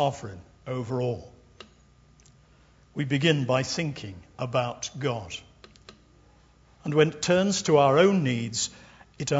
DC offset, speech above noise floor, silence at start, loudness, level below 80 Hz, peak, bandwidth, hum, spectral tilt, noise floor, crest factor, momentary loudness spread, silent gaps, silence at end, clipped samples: under 0.1%; 32 dB; 0 s; -25 LUFS; -60 dBFS; -6 dBFS; 8 kHz; 60 Hz at -55 dBFS; -5 dB/octave; -58 dBFS; 22 dB; 19 LU; none; 0 s; under 0.1%